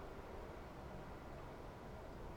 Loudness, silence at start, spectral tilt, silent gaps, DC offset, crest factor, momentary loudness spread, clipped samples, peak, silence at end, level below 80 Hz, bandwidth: -53 LUFS; 0 s; -6.5 dB/octave; none; under 0.1%; 14 dB; 1 LU; under 0.1%; -38 dBFS; 0 s; -58 dBFS; over 20 kHz